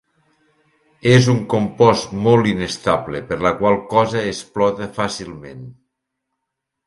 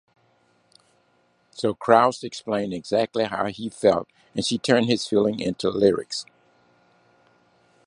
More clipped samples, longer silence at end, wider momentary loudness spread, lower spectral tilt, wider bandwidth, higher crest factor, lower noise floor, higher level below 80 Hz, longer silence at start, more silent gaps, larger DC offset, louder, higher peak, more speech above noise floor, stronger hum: neither; second, 1.15 s vs 1.65 s; about the same, 12 LU vs 11 LU; about the same, -6 dB/octave vs -5 dB/octave; about the same, 11.5 kHz vs 11 kHz; second, 18 dB vs 24 dB; first, -79 dBFS vs -64 dBFS; first, -48 dBFS vs -60 dBFS; second, 1.05 s vs 1.55 s; neither; neither; first, -17 LUFS vs -23 LUFS; about the same, 0 dBFS vs -2 dBFS; first, 62 dB vs 42 dB; neither